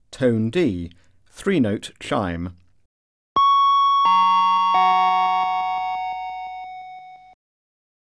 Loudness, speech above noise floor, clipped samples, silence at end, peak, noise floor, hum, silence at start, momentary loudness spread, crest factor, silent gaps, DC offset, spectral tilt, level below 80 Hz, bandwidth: -19 LUFS; 19 dB; under 0.1%; 1 s; -8 dBFS; -41 dBFS; none; 0.1 s; 18 LU; 14 dB; 2.85-3.35 s; under 0.1%; -6 dB/octave; -54 dBFS; 11 kHz